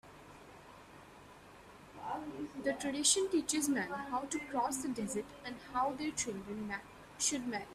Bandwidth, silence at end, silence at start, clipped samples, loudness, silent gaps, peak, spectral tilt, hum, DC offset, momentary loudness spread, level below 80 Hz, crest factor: 15.5 kHz; 0 s; 0.05 s; under 0.1%; -36 LUFS; none; -16 dBFS; -2 dB/octave; none; under 0.1%; 24 LU; -66 dBFS; 22 dB